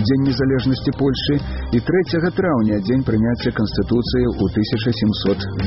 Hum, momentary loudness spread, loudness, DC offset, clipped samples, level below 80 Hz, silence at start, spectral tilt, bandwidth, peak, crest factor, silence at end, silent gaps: none; 3 LU; -19 LUFS; under 0.1%; under 0.1%; -34 dBFS; 0 s; -6 dB/octave; 6 kHz; -6 dBFS; 12 dB; 0 s; none